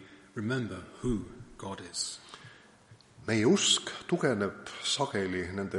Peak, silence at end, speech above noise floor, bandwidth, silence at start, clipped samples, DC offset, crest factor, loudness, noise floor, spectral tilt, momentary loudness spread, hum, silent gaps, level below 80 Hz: -12 dBFS; 0 s; 27 dB; 11.5 kHz; 0 s; under 0.1%; under 0.1%; 20 dB; -31 LUFS; -58 dBFS; -3.5 dB/octave; 19 LU; none; none; -56 dBFS